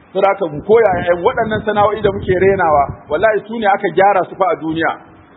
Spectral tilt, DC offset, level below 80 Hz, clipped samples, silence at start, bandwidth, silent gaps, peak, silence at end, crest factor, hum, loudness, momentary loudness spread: -9.5 dB/octave; under 0.1%; -42 dBFS; under 0.1%; 0.15 s; 4.1 kHz; none; 0 dBFS; 0.35 s; 14 dB; none; -14 LUFS; 6 LU